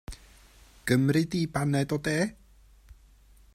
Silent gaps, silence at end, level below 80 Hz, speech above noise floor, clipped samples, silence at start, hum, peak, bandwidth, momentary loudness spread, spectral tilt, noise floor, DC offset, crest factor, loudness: none; 0.6 s; -52 dBFS; 30 dB; under 0.1%; 0.1 s; none; -10 dBFS; 16 kHz; 15 LU; -6 dB/octave; -57 dBFS; under 0.1%; 20 dB; -27 LUFS